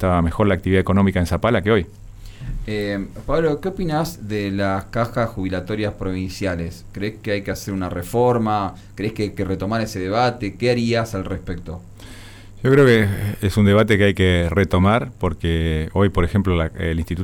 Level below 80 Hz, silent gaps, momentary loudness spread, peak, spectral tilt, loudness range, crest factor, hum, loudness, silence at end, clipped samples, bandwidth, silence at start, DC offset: -34 dBFS; none; 13 LU; -4 dBFS; -7 dB/octave; 7 LU; 14 dB; none; -20 LUFS; 0 s; under 0.1%; 18.5 kHz; 0 s; under 0.1%